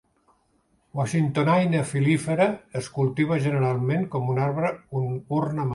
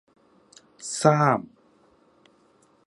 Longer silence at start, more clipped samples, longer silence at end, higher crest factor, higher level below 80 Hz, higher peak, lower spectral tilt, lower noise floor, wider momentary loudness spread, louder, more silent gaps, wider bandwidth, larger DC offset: first, 0.95 s vs 0.8 s; neither; second, 0 s vs 1.4 s; second, 18 dB vs 26 dB; first, -60 dBFS vs -72 dBFS; second, -6 dBFS vs -2 dBFS; first, -7 dB/octave vs -5.5 dB/octave; first, -66 dBFS vs -61 dBFS; second, 8 LU vs 20 LU; about the same, -24 LUFS vs -22 LUFS; neither; about the same, 11.5 kHz vs 11.5 kHz; neither